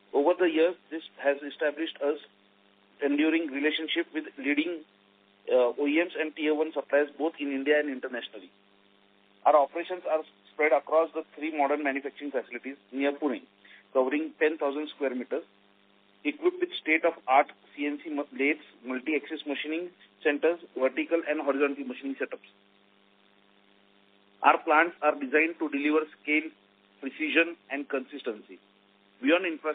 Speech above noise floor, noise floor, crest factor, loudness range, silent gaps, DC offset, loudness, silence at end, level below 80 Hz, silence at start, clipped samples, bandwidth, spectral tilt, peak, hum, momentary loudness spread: 35 dB; -63 dBFS; 24 dB; 4 LU; none; under 0.1%; -28 LUFS; 0 s; -84 dBFS; 0.15 s; under 0.1%; 4.5 kHz; 0 dB/octave; -6 dBFS; none; 12 LU